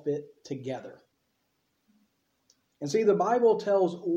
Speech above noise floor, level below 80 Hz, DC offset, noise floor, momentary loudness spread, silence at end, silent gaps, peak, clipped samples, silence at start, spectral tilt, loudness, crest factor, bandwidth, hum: 49 dB; -80 dBFS; under 0.1%; -76 dBFS; 16 LU; 0 s; none; -12 dBFS; under 0.1%; 0.05 s; -6.5 dB/octave; -27 LUFS; 18 dB; 8.4 kHz; none